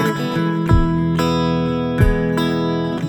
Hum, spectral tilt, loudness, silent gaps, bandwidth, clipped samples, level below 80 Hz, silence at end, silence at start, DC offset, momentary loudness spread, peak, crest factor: none; -7 dB/octave; -18 LUFS; none; 18 kHz; under 0.1%; -26 dBFS; 0 s; 0 s; under 0.1%; 3 LU; -2 dBFS; 14 dB